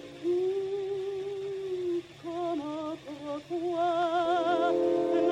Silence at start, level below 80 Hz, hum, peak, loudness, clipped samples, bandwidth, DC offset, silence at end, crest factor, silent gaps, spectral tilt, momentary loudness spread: 0 s; -70 dBFS; none; -14 dBFS; -31 LUFS; under 0.1%; 9.4 kHz; under 0.1%; 0 s; 14 dB; none; -6 dB/octave; 10 LU